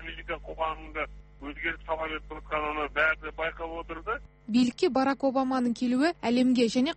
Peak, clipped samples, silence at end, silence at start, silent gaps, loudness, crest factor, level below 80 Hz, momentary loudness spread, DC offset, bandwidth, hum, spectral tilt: -14 dBFS; under 0.1%; 0 s; 0 s; none; -29 LUFS; 16 dB; -48 dBFS; 12 LU; under 0.1%; 8.8 kHz; 50 Hz at -50 dBFS; -5 dB/octave